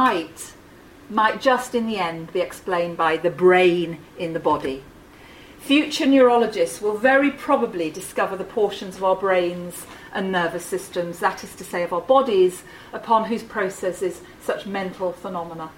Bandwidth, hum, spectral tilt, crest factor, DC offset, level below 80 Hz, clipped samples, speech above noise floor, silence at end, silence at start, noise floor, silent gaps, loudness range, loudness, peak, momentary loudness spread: 16.5 kHz; none; -4.5 dB/octave; 20 dB; under 0.1%; -56 dBFS; under 0.1%; 25 dB; 0.05 s; 0 s; -46 dBFS; none; 4 LU; -21 LUFS; -2 dBFS; 14 LU